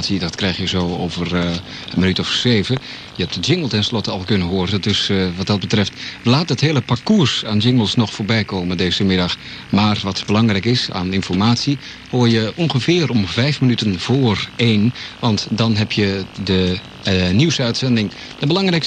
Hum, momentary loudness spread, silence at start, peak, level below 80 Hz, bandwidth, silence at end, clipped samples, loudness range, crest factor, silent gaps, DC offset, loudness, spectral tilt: none; 6 LU; 0 s; -2 dBFS; -46 dBFS; 9.4 kHz; 0 s; under 0.1%; 2 LU; 16 dB; none; under 0.1%; -17 LUFS; -5.5 dB/octave